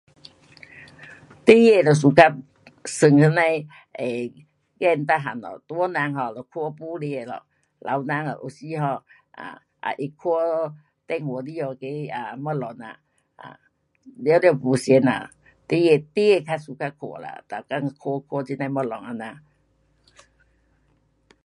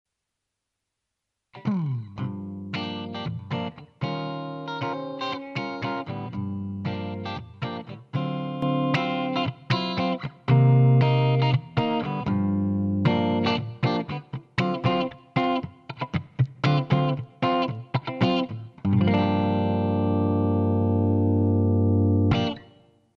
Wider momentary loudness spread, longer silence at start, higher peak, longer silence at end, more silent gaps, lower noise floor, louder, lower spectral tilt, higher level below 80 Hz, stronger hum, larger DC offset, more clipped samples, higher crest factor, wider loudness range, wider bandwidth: first, 20 LU vs 12 LU; second, 0.75 s vs 1.55 s; first, 0 dBFS vs -6 dBFS; first, 2.05 s vs 0.55 s; neither; second, -66 dBFS vs -83 dBFS; first, -22 LUFS vs -25 LUFS; second, -6.5 dB/octave vs -8.5 dB/octave; second, -68 dBFS vs -56 dBFS; neither; neither; neither; about the same, 22 dB vs 18 dB; first, 13 LU vs 9 LU; first, 11.5 kHz vs 6.4 kHz